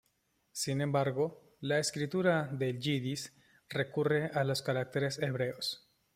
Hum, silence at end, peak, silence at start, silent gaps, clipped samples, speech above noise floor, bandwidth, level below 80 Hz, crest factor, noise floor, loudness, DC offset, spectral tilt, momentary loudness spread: none; 0.4 s; -16 dBFS; 0.55 s; none; under 0.1%; 44 dB; 16 kHz; -72 dBFS; 18 dB; -76 dBFS; -34 LUFS; under 0.1%; -5 dB/octave; 8 LU